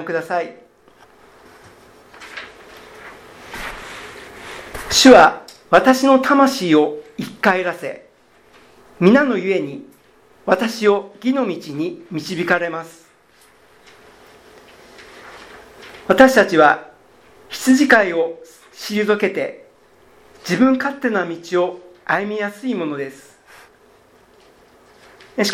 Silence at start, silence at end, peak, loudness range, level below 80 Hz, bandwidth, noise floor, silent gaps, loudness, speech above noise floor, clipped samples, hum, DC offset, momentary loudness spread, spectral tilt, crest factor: 0 s; 0 s; 0 dBFS; 16 LU; -52 dBFS; 16 kHz; -52 dBFS; none; -16 LUFS; 36 dB; under 0.1%; none; under 0.1%; 22 LU; -4 dB/octave; 18 dB